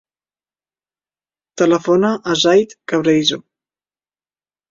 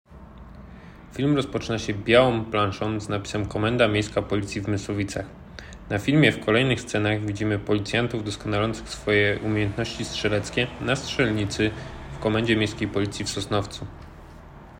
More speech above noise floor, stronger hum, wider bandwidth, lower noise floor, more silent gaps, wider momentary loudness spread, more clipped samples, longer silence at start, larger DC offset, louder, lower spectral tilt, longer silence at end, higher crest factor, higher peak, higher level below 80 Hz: first, over 75 dB vs 20 dB; first, 50 Hz at -60 dBFS vs none; second, 7.6 kHz vs 15.5 kHz; first, under -90 dBFS vs -44 dBFS; neither; second, 6 LU vs 18 LU; neither; first, 1.55 s vs 0.1 s; neither; first, -15 LUFS vs -24 LUFS; about the same, -4.5 dB/octave vs -5.5 dB/octave; first, 1.3 s vs 0 s; about the same, 18 dB vs 20 dB; first, 0 dBFS vs -4 dBFS; second, -60 dBFS vs -46 dBFS